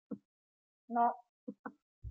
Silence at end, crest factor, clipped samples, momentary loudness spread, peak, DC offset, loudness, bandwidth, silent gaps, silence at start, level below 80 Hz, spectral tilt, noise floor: 0 s; 20 dB; under 0.1%; 19 LU; -20 dBFS; under 0.1%; -35 LUFS; 3.3 kHz; 0.25-0.88 s, 1.29-1.47 s, 1.59-1.64 s, 1.82-2.02 s; 0.1 s; -64 dBFS; -7.5 dB/octave; under -90 dBFS